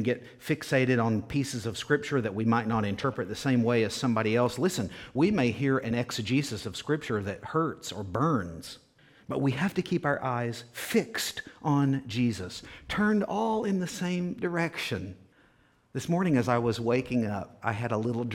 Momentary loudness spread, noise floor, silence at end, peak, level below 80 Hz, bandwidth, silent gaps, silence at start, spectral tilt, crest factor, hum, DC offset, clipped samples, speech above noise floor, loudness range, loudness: 9 LU; -64 dBFS; 0 s; -10 dBFS; -58 dBFS; 17 kHz; none; 0 s; -6 dB/octave; 20 dB; none; under 0.1%; under 0.1%; 35 dB; 4 LU; -29 LUFS